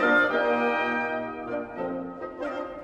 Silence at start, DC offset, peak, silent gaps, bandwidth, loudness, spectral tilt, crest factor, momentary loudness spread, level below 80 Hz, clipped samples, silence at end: 0 s; under 0.1%; -10 dBFS; none; 8.8 kHz; -27 LUFS; -5.5 dB/octave; 18 dB; 12 LU; -60 dBFS; under 0.1%; 0 s